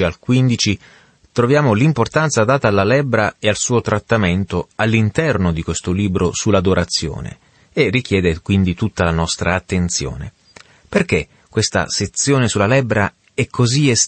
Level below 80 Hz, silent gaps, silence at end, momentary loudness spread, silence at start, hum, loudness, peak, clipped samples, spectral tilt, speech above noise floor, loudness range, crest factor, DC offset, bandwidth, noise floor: -38 dBFS; none; 0 s; 7 LU; 0 s; none; -17 LUFS; -2 dBFS; under 0.1%; -5 dB/octave; 30 dB; 3 LU; 14 dB; under 0.1%; 8.8 kHz; -46 dBFS